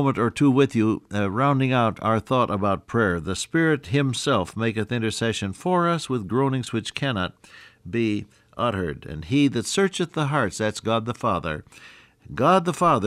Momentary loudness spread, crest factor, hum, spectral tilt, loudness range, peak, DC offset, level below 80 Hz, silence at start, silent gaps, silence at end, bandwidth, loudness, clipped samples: 9 LU; 16 dB; none; -5.5 dB/octave; 4 LU; -6 dBFS; under 0.1%; -52 dBFS; 0 s; none; 0 s; 14.5 kHz; -23 LUFS; under 0.1%